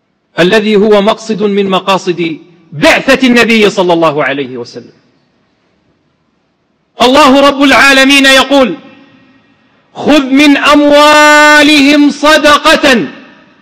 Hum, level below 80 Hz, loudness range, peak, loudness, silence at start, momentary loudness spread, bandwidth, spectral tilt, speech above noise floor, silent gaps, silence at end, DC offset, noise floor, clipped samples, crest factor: none; -40 dBFS; 8 LU; 0 dBFS; -5 LUFS; 0.35 s; 13 LU; 16.5 kHz; -3.5 dB/octave; 51 dB; none; 0.4 s; under 0.1%; -57 dBFS; 0.3%; 8 dB